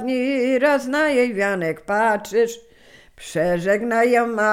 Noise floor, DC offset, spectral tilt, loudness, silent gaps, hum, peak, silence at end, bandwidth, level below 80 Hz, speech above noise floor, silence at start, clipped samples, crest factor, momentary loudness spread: -49 dBFS; under 0.1%; -5 dB/octave; -20 LUFS; none; none; -6 dBFS; 0 s; 16 kHz; -56 dBFS; 29 dB; 0 s; under 0.1%; 14 dB; 7 LU